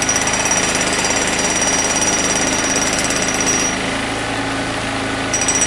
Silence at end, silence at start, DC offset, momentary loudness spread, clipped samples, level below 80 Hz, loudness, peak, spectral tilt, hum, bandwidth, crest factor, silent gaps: 0 s; 0 s; under 0.1%; 6 LU; under 0.1%; -38 dBFS; -16 LUFS; -2 dBFS; -1.5 dB/octave; none; 12 kHz; 14 dB; none